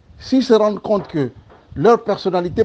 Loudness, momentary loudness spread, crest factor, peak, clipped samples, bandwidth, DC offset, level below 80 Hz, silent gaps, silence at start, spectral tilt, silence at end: -17 LUFS; 9 LU; 16 dB; 0 dBFS; under 0.1%; 8 kHz; under 0.1%; -48 dBFS; none; 0.2 s; -7 dB/octave; 0 s